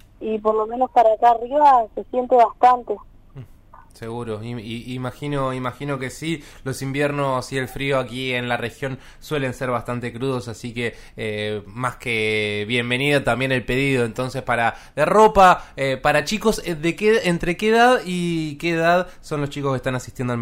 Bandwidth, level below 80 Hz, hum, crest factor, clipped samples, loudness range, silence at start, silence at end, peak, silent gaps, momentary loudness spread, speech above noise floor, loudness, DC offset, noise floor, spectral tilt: 16 kHz; -44 dBFS; none; 18 dB; under 0.1%; 9 LU; 0.2 s; 0 s; -2 dBFS; none; 14 LU; 26 dB; -20 LUFS; under 0.1%; -46 dBFS; -5.5 dB/octave